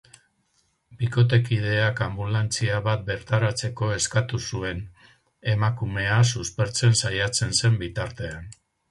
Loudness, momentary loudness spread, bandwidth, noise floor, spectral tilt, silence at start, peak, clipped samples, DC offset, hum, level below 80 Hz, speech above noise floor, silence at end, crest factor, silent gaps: -24 LUFS; 11 LU; 11.5 kHz; -69 dBFS; -4.5 dB/octave; 0.9 s; -6 dBFS; under 0.1%; under 0.1%; none; -46 dBFS; 45 dB; 0.4 s; 18 dB; none